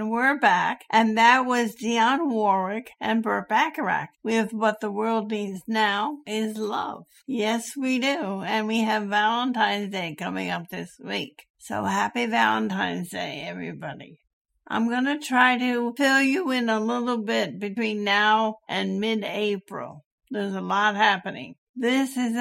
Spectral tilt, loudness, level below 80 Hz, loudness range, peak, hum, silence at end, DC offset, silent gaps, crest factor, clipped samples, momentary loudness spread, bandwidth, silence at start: -4 dB/octave; -24 LUFS; -72 dBFS; 5 LU; -4 dBFS; none; 0 s; under 0.1%; 11.50-11.54 s, 14.33-14.45 s, 20.06-20.18 s, 21.58-21.74 s; 20 dB; under 0.1%; 12 LU; 16.5 kHz; 0 s